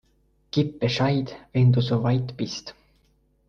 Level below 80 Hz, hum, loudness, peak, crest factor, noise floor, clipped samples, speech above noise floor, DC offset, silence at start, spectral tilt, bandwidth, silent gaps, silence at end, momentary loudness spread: -52 dBFS; none; -24 LUFS; -8 dBFS; 16 dB; -64 dBFS; under 0.1%; 42 dB; under 0.1%; 0.55 s; -7 dB/octave; 6.8 kHz; none; 0.75 s; 11 LU